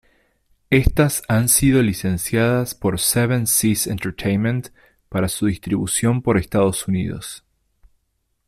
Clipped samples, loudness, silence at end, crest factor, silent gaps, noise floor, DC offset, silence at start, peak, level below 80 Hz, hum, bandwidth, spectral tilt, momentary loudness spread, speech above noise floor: under 0.1%; -19 LUFS; 1.1 s; 18 dB; none; -70 dBFS; under 0.1%; 0.7 s; -2 dBFS; -36 dBFS; none; 15.5 kHz; -5 dB/octave; 8 LU; 51 dB